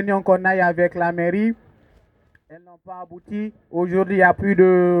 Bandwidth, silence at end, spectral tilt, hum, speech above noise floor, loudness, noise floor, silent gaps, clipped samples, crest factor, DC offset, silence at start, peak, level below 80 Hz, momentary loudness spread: 5 kHz; 0 s; -9.5 dB/octave; none; 40 dB; -18 LUFS; -59 dBFS; none; under 0.1%; 18 dB; under 0.1%; 0 s; -2 dBFS; -54 dBFS; 21 LU